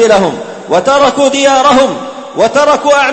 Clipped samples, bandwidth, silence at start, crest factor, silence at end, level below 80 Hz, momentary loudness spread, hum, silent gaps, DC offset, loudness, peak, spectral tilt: 0.3%; 8.8 kHz; 0 s; 8 dB; 0 s; -46 dBFS; 10 LU; none; none; under 0.1%; -9 LUFS; 0 dBFS; -3.5 dB/octave